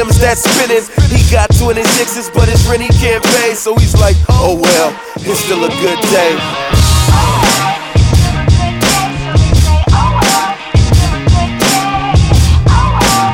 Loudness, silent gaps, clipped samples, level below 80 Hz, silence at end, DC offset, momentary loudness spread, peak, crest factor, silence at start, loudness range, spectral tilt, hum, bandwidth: -10 LUFS; none; under 0.1%; -16 dBFS; 0 s; under 0.1%; 4 LU; 0 dBFS; 10 dB; 0 s; 1 LU; -4.5 dB/octave; none; 18.5 kHz